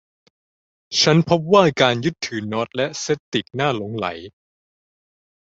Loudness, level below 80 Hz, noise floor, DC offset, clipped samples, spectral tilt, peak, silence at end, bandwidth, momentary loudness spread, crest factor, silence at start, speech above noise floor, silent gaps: -19 LUFS; -56 dBFS; under -90 dBFS; under 0.1%; under 0.1%; -4.5 dB/octave; 0 dBFS; 1.25 s; 8 kHz; 11 LU; 20 dB; 0.9 s; over 71 dB; 3.20-3.32 s